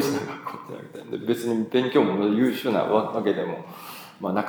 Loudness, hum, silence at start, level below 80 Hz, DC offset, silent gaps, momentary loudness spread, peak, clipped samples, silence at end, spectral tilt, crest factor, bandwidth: -24 LUFS; none; 0 s; -78 dBFS; under 0.1%; none; 17 LU; -6 dBFS; under 0.1%; 0 s; -6 dB/octave; 18 dB; over 20 kHz